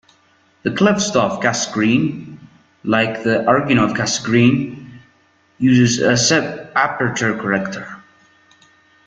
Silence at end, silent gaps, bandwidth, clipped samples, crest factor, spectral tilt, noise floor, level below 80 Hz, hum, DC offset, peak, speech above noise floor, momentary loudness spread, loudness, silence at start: 1.1 s; none; 9.4 kHz; under 0.1%; 16 dB; -4.5 dB/octave; -56 dBFS; -54 dBFS; none; under 0.1%; -2 dBFS; 40 dB; 13 LU; -16 LUFS; 0.65 s